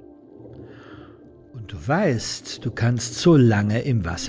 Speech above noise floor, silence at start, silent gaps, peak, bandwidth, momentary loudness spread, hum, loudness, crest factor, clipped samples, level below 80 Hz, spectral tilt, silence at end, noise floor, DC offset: 26 dB; 0.4 s; none; -6 dBFS; 8 kHz; 26 LU; none; -21 LUFS; 16 dB; under 0.1%; -44 dBFS; -6 dB/octave; 0 s; -47 dBFS; under 0.1%